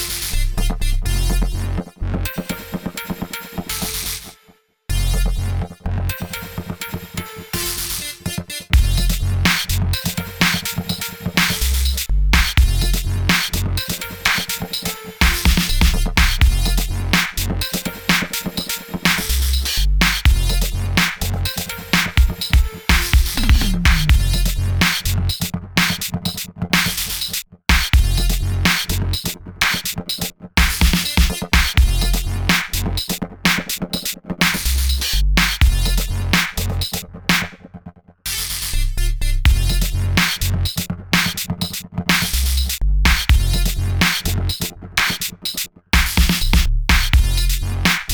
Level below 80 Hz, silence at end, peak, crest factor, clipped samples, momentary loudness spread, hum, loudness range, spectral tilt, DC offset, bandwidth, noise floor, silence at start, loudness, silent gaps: -20 dBFS; 0 s; 0 dBFS; 18 dB; under 0.1%; 9 LU; none; 7 LU; -3.5 dB/octave; under 0.1%; over 20 kHz; -54 dBFS; 0 s; -19 LUFS; none